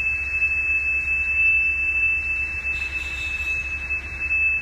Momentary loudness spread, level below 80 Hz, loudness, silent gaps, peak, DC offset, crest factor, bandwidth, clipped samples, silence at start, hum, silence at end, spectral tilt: 9 LU; -38 dBFS; -20 LUFS; none; -12 dBFS; under 0.1%; 12 dB; 13.5 kHz; under 0.1%; 0 s; none; 0 s; -3 dB/octave